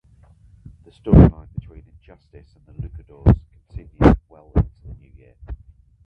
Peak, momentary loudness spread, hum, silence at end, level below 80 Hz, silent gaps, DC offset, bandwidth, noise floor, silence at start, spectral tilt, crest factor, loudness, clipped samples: 0 dBFS; 27 LU; none; 0.5 s; -26 dBFS; none; under 0.1%; 5.4 kHz; -51 dBFS; 1.05 s; -10.5 dB/octave; 20 dB; -17 LUFS; under 0.1%